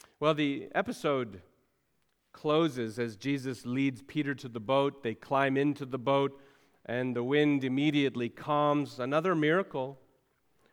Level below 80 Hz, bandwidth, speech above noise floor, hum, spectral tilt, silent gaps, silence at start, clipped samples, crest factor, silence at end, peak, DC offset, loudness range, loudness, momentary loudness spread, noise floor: -74 dBFS; 12.5 kHz; 46 dB; none; -6.5 dB/octave; none; 0.2 s; under 0.1%; 20 dB; 0.75 s; -12 dBFS; under 0.1%; 4 LU; -31 LUFS; 9 LU; -76 dBFS